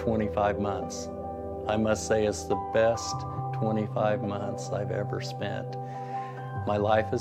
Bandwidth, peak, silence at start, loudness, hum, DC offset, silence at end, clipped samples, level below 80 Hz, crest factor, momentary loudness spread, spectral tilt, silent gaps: 14 kHz; -10 dBFS; 0 s; -29 LUFS; none; under 0.1%; 0 s; under 0.1%; -52 dBFS; 18 dB; 10 LU; -6 dB/octave; none